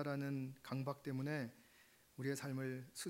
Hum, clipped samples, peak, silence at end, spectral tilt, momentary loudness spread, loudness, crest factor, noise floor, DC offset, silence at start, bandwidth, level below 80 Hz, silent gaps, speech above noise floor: none; under 0.1%; -28 dBFS; 0 s; -6 dB/octave; 7 LU; -45 LUFS; 18 dB; -69 dBFS; under 0.1%; 0 s; 16 kHz; -84 dBFS; none; 25 dB